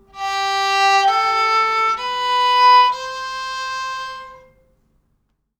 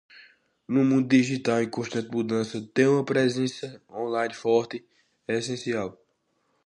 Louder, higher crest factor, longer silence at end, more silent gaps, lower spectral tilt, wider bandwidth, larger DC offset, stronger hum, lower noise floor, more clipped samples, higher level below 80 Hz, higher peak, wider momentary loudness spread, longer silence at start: first, -16 LUFS vs -25 LUFS; about the same, 14 dB vs 18 dB; first, 1.25 s vs 0.75 s; neither; second, 0.5 dB/octave vs -6 dB/octave; first, 14.5 kHz vs 11 kHz; neither; neither; second, -67 dBFS vs -72 dBFS; neither; first, -58 dBFS vs -70 dBFS; first, -4 dBFS vs -8 dBFS; about the same, 15 LU vs 14 LU; second, 0.15 s vs 0.7 s